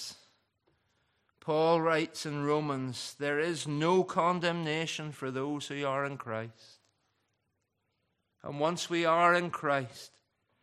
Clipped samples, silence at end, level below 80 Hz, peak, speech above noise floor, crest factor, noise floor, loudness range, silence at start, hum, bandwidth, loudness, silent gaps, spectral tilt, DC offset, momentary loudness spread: under 0.1%; 0.55 s; -78 dBFS; -12 dBFS; 50 dB; 20 dB; -80 dBFS; 8 LU; 0 s; none; 14 kHz; -31 LUFS; none; -5 dB/octave; under 0.1%; 13 LU